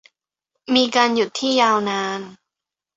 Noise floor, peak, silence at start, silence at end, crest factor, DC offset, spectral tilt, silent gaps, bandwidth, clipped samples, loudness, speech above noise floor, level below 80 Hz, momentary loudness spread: -86 dBFS; -2 dBFS; 0.7 s; 0.65 s; 20 dB; under 0.1%; -3 dB/octave; none; 8 kHz; under 0.1%; -18 LUFS; 67 dB; -64 dBFS; 11 LU